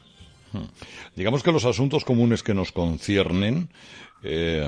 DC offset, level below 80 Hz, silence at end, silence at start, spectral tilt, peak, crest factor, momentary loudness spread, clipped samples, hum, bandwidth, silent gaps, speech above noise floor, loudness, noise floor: under 0.1%; -46 dBFS; 0 s; 0.2 s; -6 dB/octave; -6 dBFS; 18 dB; 18 LU; under 0.1%; none; 10.5 kHz; none; 27 dB; -23 LUFS; -51 dBFS